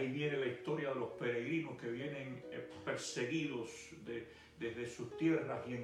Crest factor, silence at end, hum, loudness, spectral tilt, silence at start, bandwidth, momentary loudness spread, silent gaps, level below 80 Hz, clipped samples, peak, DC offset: 16 dB; 0 s; none; -41 LUFS; -5.5 dB/octave; 0 s; 12 kHz; 10 LU; none; -74 dBFS; under 0.1%; -24 dBFS; under 0.1%